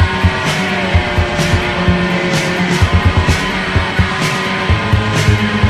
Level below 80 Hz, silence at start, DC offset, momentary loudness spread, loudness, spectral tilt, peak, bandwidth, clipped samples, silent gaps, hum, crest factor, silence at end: -26 dBFS; 0 s; under 0.1%; 2 LU; -14 LUFS; -5.5 dB/octave; 0 dBFS; 14.5 kHz; under 0.1%; none; none; 14 dB; 0 s